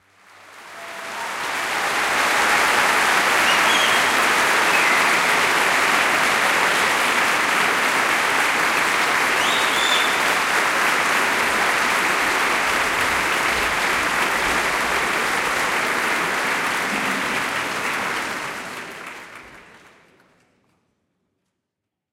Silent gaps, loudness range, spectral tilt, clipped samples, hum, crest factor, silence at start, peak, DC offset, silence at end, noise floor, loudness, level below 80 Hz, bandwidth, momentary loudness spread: none; 9 LU; -1 dB/octave; under 0.1%; none; 16 dB; 0.45 s; -4 dBFS; under 0.1%; 2.5 s; -82 dBFS; -18 LUFS; -52 dBFS; 16.5 kHz; 8 LU